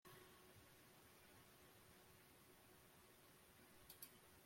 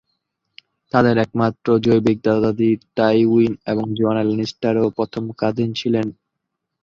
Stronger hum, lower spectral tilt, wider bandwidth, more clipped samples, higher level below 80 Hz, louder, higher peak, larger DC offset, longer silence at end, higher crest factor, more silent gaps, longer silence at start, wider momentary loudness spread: neither; second, -3 dB/octave vs -7.5 dB/octave; first, 16.5 kHz vs 7.2 kHz; neither; second, -84 dBFS vs -54 dBFS; second, -66 LUFS vs -19 LUFS; second, -40 dBFS vs 0 dBFS; neither; second, 0 s vs 0.75 s; first, 26 dB vs 18 dB; neither; second, 0.05 s vs 0.95 s; about the same, 7 LU vs 7 LU